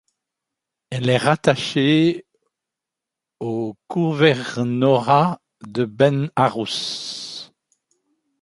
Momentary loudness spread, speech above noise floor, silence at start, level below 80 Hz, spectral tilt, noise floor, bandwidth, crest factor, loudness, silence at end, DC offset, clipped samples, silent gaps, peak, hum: 14 LU; 67 dB; 0.9 s; -62 dBFS; -6 dB/octave; -86 dBFS; 11.5 kHz; 20 dB; -20 LUFS; 0.95 s; under 0.1%; under 0.1%; none; 0 dBFS; none